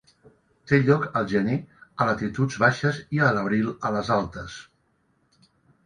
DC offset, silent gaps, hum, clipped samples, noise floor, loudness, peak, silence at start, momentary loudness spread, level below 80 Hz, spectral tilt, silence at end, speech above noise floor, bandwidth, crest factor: under 0.1%; none; none; under 0.1%; -68 dBFS; -24 LUFS; -4 dBFS; 0.65 s; 12 LU; -54 dBFS; -7 dB/octave; 1.25 s; 44 dB; 10 kHz; 20 dB